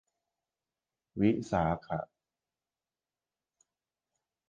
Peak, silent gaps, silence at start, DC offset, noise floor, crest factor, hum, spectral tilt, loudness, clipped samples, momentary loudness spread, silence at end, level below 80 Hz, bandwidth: -14 dBFS; none; 1.15 s; under 0.1%; under -90 dBFS; 24 dB; none; -8 dB/octave; -32 LUFS; under 0.1%; 15 LU; 2.45 s; -58 dBFS; 9 kHz